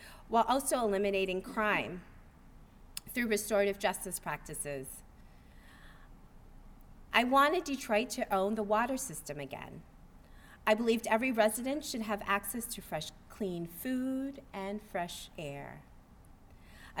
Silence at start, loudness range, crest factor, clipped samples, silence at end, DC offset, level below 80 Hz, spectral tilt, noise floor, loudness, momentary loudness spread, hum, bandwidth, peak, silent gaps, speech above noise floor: 0 s; 8 LU; 24 dB; under 0.1%; 0 s; under 0.1%; -56 dBFS; -3.5 dB/octave; -57 dBFS; -33 LUFS; 15 LU; none; over 20 kHz; -12 dBFS; none; 24 dB